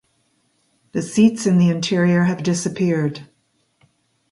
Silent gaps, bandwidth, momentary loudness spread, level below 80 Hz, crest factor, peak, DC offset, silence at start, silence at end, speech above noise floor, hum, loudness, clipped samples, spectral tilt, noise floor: none; 11.5 kHz; 11 LU; -60 dBFS; 16 dB; -4 dBFS; under 0.1%; 0.95 s; 1.05 s; 48 dB; none; -18 LUFS; under 0.1%; -6 dB/octave; -65 dBFS